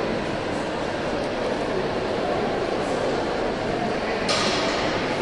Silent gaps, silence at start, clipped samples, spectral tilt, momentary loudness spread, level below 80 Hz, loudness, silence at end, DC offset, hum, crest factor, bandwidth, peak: none; 0 s; under 0.1%; -4.5 dB/octave; 5 LU; -44 dBFS; -25 LUFS; 0 s; under 0.1%; none; 14 dB; 11.5 kHz; -10 dBFS